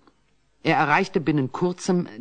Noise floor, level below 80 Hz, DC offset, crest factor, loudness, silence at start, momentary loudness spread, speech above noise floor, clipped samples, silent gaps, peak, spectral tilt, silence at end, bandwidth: -66 dBFS; -58 dBFS; under 0.1%; 20 dB; -23 LUFS; 0.65 s; 6 LU; 44 dB; under 0.1%; none; -4 dBFS; -6 dB/octave; 0 s; 9.4 kHz